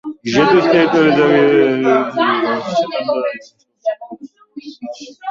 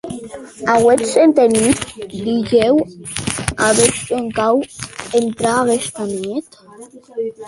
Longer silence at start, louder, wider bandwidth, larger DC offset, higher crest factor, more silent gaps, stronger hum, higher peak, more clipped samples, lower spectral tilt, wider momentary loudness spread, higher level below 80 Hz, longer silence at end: about the same, 0.05 s vs 0.05 s; about the same, -14 LUFS vs -16 LUFS; second, 7.6 kHz vs 11.5 kHz; neither; about the same, 14 dB vs 16 dB; neither; neither; about the same, 0 dBFS vs 0 dBFS; neither; first, -6 dB/octave vs -4 dB/octave; first, 21 LU vs 15 LU; second, -56 dBFS vs -44 dBFS; about the same, 0 s vs 0 s